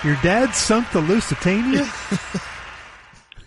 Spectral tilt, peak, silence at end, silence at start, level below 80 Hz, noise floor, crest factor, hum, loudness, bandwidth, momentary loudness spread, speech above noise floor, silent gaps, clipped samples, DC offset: -4.5 dB/octave; -6 dBFS; 0.05 s; 0 s; -40 dBFS; -45 dBFS; 16 dB; none; -20 LUFS; 11.5 kHz; 17 LU; 26 dB; none; under 0.1%; under 0.1%